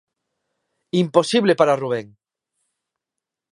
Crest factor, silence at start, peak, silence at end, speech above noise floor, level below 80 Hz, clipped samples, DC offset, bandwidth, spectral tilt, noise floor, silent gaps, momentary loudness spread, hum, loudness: 22 dB; 0.95 s; 0 dBFS; 1.45 s; 67 dB; -70 dBFS; under 0.1%; under 0.1%; 11 kHz; -5.5 dB/octave; -85 dBFS; none; 9 LU; none; -19 LUFS